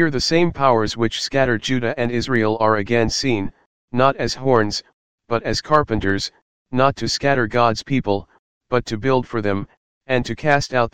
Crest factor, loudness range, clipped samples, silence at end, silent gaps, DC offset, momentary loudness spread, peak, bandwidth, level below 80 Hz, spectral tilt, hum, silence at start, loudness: 18 dB; 2 LU; under 0.1%; 0 s; 3.66-3.88 s, 4.93-5.18 s, 6.42-6.65 s, 8.39-8.61 s, 9.77-10.01 s; 2%; 7 LU; 0 dBFS; 16 kHz; -42 dBFS; -5 dB/octave; none; 0 s; -19 LUFS